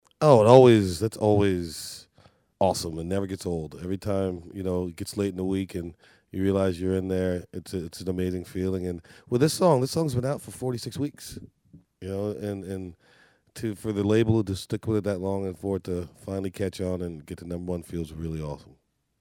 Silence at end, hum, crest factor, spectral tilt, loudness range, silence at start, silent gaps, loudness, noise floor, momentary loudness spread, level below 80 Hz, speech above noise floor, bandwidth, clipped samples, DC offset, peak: 0.65 s; none; 24 dB; -6.5 dB/octave; 6 LU; 0.2 s; none; -26 LUFS; -60 dBFS; 15 LU; -52 dBFS; 34 dB; 17.5 kHz; under 0.1%; under 0.1%; -2 dBFS